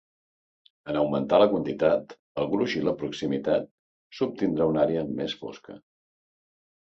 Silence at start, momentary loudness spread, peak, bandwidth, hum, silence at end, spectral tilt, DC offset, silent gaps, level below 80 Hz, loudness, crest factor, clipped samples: 0.85 s; 16 LU; -8 dBFS; 7.8 kHz; none; 1.05 s; -7 dB/octave; under 0.1%; 2.19-2.35 s, 3.71-4.10 s; -60 dBFS; -26 LUFS; 20 dB; under 0.1%